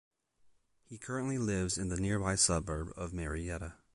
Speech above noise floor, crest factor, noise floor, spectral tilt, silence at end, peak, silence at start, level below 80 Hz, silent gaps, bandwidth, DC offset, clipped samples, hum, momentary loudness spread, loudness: 34 dB; 22 dB; -69 dBFS; -4 dB/octave; 0.2 s; -14 dBFS; 0.9 s; -48 dBFS; none; 11.5 kHz; under 0.1%; under 0.1%; none; 13 LU; -34 LUFS